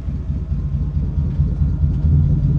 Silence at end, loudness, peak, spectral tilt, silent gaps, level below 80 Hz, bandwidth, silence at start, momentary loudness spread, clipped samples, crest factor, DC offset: 0 s; -20 LUFS; -4 dBFS; -11.5 dB/octave; none; -22 dBFS; 2.7 kHz; 0 s; 8 LU; under 0.1%; 12 dB; under 0.1%